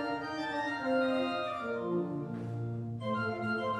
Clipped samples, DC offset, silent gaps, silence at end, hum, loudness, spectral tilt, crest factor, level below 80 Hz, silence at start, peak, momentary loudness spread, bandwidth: under 0.1%; under 0.1%; none; 0 s; none; -34 LUFS; -7 dB/octave; 14 dB; -70 dBFS; 0 s; -20 dBFS; 7 LU; 11 kHz